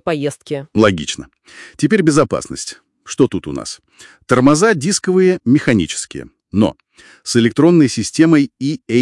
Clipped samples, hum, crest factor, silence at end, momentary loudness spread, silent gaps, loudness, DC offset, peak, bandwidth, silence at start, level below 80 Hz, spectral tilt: under 0.1%; none; 16 dB; 0 s; 15 LU; none; -15 LUFS; under 0.1%; 0 dBFS; 12 kHz; 0.05 s; -50 dBFS; -5.5 dB/octave